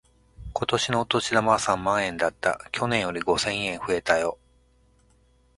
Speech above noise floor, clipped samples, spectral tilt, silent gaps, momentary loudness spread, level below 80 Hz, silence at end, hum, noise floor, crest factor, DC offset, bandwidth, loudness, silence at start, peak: 36 dB; under 0.1%; -3.5 dB/octave; none; 6 LU; -52 dBFS; 1.25 s; none; -61 dBFS; 22 dB; under 0.1%; 11.5 kHz; -25 LUFS; 0.4 s; -4 dBFS